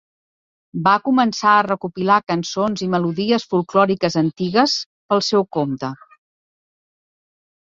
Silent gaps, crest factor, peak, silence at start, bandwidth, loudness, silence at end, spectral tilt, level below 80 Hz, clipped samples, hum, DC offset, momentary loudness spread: 4.86-5.09 s; 18 dB; -2 dBFS; 0.75 s; 7.8 kHz; -18 LUFS; 1.8 s; -5 dB/octave; -62 dBFS; under 0.1%; none; under 0.1%; 8 LU